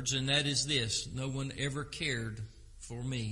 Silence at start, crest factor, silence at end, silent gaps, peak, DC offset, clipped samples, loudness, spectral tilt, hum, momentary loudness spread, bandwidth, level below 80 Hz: 0 s; 20 dB; 0 s; none; -16 dBFS; under 0.1%; under 0.1%; -33 LUFS; -3 dB/octave; none; 17 LU; 11.5 kHz; -54 dBFS